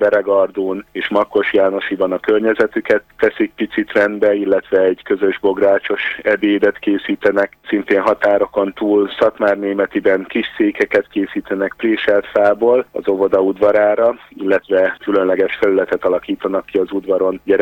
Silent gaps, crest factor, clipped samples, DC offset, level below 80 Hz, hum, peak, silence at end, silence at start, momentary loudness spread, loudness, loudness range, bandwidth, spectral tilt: none; 14 dB; under 0.1%; under 0.1%; -54 dBFS; none; -2 dBFS; 0 s; 0 s; 6 LU; -16 LUFS; 2 LU; 17 kHz; -6.5 dB/octave